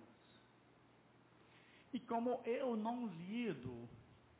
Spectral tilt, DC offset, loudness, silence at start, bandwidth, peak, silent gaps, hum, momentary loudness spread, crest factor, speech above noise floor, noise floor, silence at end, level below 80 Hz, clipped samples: -5.5 dB/octave; under 0.1%; -43 LUFS; 0 s; 4 kHz; -30 dBFS; none; none; 24 LU; 16 dB; 27 dB; -69 dBFS; 0.25 s; -78 dBFS; under 0.1%